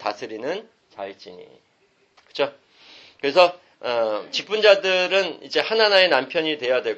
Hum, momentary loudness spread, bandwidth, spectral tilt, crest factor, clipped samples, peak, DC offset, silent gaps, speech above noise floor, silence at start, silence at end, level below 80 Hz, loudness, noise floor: none; 19 LU; 8.2 kHz; -3 dB/octave; 20 dB; under 0.1%; -2 dBFS; under 0.1%; none; 39 dB; 0 s; 0 s; -74 dBFS; -20 LUFS; -60 dBFS